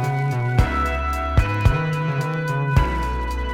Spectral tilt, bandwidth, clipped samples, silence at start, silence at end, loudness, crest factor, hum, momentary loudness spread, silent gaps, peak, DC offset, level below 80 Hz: -7 dB/octave; 15.5 kHz; under 0.1%; 0 s; 0 s; -21 LUFS; 16 dB; none; 4 LU; none; -4 dBFS; under 0.1%; -26 dBFS